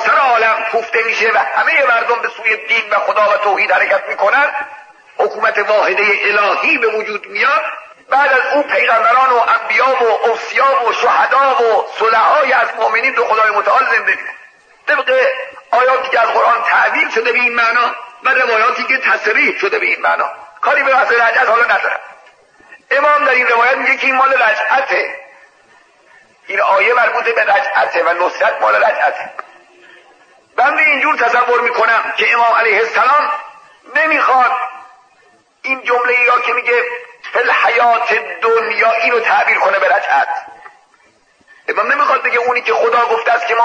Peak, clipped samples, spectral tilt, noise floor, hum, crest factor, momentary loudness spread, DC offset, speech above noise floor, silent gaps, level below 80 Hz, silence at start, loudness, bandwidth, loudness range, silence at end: -2 dBFS; under 0.1%; -2 dB/octave; -52 dBFS; none; 12 dB; 8 LU; under 0.1%; 39 dB; none; -72 dBFS; 0 s; -12 LUFS; 9 kHz; 3 LU; 0 s